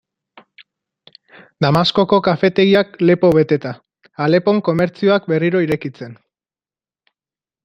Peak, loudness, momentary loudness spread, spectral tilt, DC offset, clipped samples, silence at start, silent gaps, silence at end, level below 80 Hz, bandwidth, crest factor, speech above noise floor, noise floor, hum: 0 dBFS; -15 LUFS; 12 LU; -7.5 dB/octave; under 0.1%; under 0.1%; 1.6 s; none; 1.5 s; -54 dBFS; 13 kHz; 16 dB; over 75 dB; under -90 dBFS; none